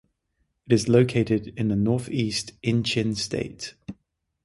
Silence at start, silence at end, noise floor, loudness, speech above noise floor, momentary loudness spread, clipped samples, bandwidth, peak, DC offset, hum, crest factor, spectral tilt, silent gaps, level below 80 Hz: 0.7 s; 0.5 s; -74 dBFS; -24 LUFS; 50 dB; 16 LU; under 0.1%; 11.5 kHz; -4 dBFS; under 0.1%; none; 20 dB; -5.5 dB/octave; none; -52 dBFS